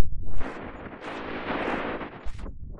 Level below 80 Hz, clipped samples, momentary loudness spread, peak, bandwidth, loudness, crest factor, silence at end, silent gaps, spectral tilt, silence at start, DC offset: -38 dBFS; under 0.1%; 11 LU; -6 dBFS; 7 kHz; -34 LUFS; 16 dB; 0 s; none; -6.5 dB/octave; 0 s; under 0.1%